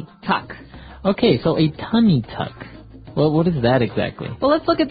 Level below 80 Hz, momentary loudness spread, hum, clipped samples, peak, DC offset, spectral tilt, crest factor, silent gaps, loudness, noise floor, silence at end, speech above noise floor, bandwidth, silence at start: -44 dBFS; 13 LU; none; under 0.1%; -2 dBFS; under 0.1%; -12 dB/octave; 16 dB; none; -19 LUFS; -39 dBFS; 0 s; 21 dB; 5 kHz; 0 s